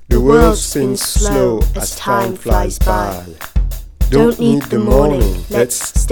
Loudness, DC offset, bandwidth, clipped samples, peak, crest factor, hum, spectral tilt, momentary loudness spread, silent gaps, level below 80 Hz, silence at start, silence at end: -15 LUFS; under 0.1%; 19.5 kHz; under 0.1%; 0 dBFS; 14 dB; none; -5.5 dB/octave; 10 LU; none; -18 dBFS; 0 s; 0 s